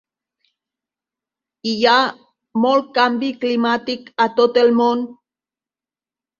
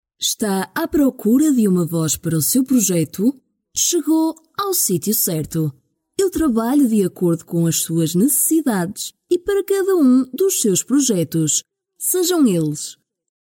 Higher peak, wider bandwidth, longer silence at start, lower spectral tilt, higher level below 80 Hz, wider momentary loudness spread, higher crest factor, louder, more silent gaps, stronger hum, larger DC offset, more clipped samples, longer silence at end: first, -2 dBFS vs -6 dBFS; second, 7.2 kHz vs 17 kHz; first, 1.65 s vs 0.2 s; about the same, -4.5 dB/octave vs -4.5 dB/octave; second, -68 dBFS vs -50 dBFS; first, 11 LU vs 7 LU; first, 18 dB vs 12 dB; about the same, -17 LUFS vs -18 LUFS; neither; neither; neither; neither; first, 1.25 s vs 0.55 s